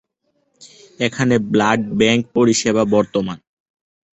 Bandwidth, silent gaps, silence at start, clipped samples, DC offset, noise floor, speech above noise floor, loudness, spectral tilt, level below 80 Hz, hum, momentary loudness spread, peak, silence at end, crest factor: 8.2 kHz; none; 0.6 s; under 0.1%; under 0.1%; -67 dBFS; 51 dB; -17 LUFS; -4.5 dB/octave; -54 dBFS; none; 8 LU; -2 dBFS; 0.75 s; 16 dB